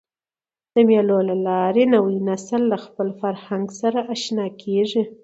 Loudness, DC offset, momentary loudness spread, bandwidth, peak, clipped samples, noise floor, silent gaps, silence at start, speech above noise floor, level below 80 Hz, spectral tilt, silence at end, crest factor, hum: -20 LUFS; under 0.1%; 9 LU; 8 kHz; -4 dBFS; under 0.1%; under -90 dBFS; none; 0.75 s; over 70 dB; -70 dBFS; -6 dB/octave; 0.1 s; 18 dB; none